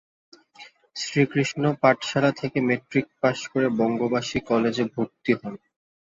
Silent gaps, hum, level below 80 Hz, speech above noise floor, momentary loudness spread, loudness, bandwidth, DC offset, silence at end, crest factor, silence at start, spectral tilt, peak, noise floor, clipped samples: none; none; -60 dBFS; 26 dB; 7 LU; -24 LUFS; 8 kHz; under 0.1%; 0.55 s; 20 dB; 0.6 s; -5.5 dB/octave; -4 dBFS; -50 dBFS; under 0.1%